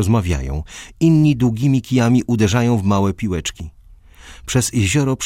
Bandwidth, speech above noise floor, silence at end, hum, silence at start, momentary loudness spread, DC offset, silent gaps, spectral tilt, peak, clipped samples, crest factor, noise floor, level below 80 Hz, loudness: 16 kHz; 27 dB; 0 s; none; 0 s; 13 LU; under 0.1%; none; -6 dB/octave; -2 dBFS; under 0.1%; 16 dB; -43 dBFS; -34 dBFS; -17 LUFS